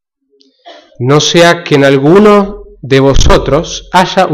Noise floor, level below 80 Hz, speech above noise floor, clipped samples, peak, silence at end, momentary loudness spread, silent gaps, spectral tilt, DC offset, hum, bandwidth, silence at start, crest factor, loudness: -51 dBFS; -18 dBFS; 45 dB; 0.4%; 0 dBFS; 0 s; 8 LU; none; -5 dB/octave; under 0.1%; none; 15 kHz; 0.65 s; 8 dB; -7 LUFS